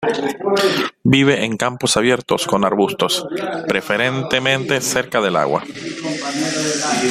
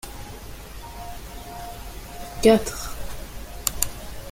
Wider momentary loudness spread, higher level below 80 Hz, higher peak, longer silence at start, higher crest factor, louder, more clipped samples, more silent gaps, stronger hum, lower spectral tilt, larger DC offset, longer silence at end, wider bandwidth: second, 7 LU vs 21 LU; second, -54 dBFS vs -38 dBFS; about the same, 0 dBFS vs 0 dBFS; about the same, 0 s vs 0.05 s; second, 18 dB vs 26 dB; first, -17 LUFS vs -24 LUFS; neither; neither; neither; about the same, -3.5 dB/octave vs -4 dB/octave; neither; about the same, 0 s vs 0 s; about the same, 16 kHz vs 17 kHz